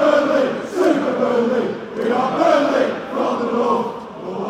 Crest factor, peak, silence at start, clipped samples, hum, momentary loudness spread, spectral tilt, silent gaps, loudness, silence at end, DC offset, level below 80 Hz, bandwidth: 16 dB; -2 dBFS; 0 s; under 0.1%; none; 8 LU; -5.5 dB/octave; none; -18 LUFS; 0 s; under 0.1%; -58 dBFS; 14.5 kHz